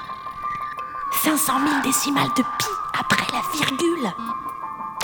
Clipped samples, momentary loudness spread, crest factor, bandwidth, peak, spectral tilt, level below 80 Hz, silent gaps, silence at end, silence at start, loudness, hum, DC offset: under 0.1%; 11 LU; 22 dB; over 20 kHz; -2 dBFS; -2.5 dB/octave; -56 dBFS; none; 0 s; 0 s; -22 LUFS; none; under 0.1%